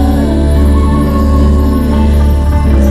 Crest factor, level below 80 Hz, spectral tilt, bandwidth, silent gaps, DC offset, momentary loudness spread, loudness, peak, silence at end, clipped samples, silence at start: 8 dB; -10 dBFS; -8 dB/octave; 13 kHz; none; under 0.1%; 1 LU; -10 LUFS; 0 dBFS; 0 s; under 0.1%; 0 s